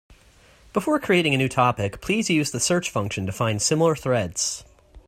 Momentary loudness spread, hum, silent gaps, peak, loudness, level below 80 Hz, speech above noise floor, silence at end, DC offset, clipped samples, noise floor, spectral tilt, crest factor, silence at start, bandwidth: 7 LU; none; none; -4 dBFS; -22 LUFS; -52 dBFS; 31 dB; 0.1 s; under 0.1%; under 0.1%; -54 dBFS; -4 dB/octave; 18 dB; 0.75 s; 16 kHz